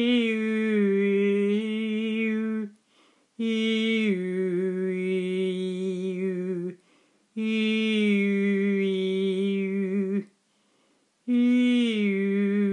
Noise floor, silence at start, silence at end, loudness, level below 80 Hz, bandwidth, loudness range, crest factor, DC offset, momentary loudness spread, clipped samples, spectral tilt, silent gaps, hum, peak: -67 dBFS; 0 s; 0 s; -26 LUFS; -84 dBFS; 9.6 kHz; 3 LU; 12 dB; under 0.1%; 7 LU; under 0.1%; -7 dB/octave; none; none; -14 dBFS